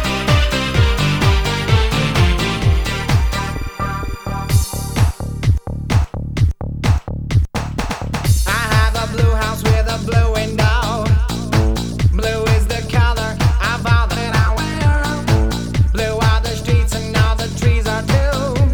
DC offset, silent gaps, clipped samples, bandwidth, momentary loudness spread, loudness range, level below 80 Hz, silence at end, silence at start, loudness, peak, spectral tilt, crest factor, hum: under 0.1%; none; under 0.1%; over 20 kHz; 5 LU; 3 LU; -20 dBFS; 0 s; 0 s; -17 LUFS; 0 dBFS; -5.5 dB/octave; 14 dB; none